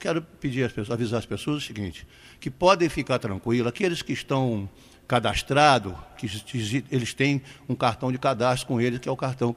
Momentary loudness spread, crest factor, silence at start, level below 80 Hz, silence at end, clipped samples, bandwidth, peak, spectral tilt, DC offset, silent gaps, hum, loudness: 14 LU; 22 dB; 0 s; -50 dBFS; 0 s; under 0.1%; 15 kHz; -4 dBFS; -5.5 dB/octave; under 0.1%; none; none; -25 LUFS